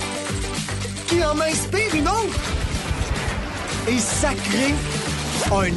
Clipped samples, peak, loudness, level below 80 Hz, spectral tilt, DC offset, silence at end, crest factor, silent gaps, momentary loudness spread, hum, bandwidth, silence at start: under 0.1%; -8 dBFS; -22 LUFS; -32 dBFS; -4 dB/octave; under 0.1%; 0 s; 14 dB; none; 6 LU; none; 12 kHz; 0 s